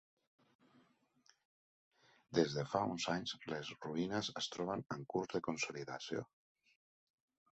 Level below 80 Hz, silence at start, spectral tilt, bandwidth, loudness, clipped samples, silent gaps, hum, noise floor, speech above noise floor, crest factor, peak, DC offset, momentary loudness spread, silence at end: -76 dBFS; 2.3 s; -4 dB/octave; 8 kHz; -41 LUFS; under 0.1%; none; none; -74 dBFS; 34 dB; 24 dB; -18 dBFS; under 0.1%; 8 LU; 1.3 s